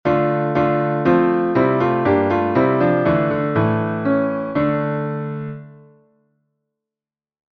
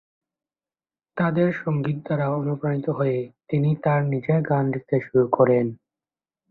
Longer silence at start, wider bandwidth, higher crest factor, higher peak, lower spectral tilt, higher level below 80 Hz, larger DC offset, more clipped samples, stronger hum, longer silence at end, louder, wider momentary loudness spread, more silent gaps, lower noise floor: second, 0.05 s vs 1.15 s; first, 5.8 kHz vs 4.2 kHz; about the same, 16 dB vs 20 dB; about the same, -2 dBFS vs -4 dBFS; second, -10 dB/octave vs -11.5 dB/octave; first, -50 dBFS vs -62 dBFS; neither; neither; neither; first, 1.85 s vs 0.75 s; first, -18 LUFS vs -23 LUFS; about the same, 8 LU vs 7 LU; neither; about the same, under -90 dBFS vs under -90 dBFS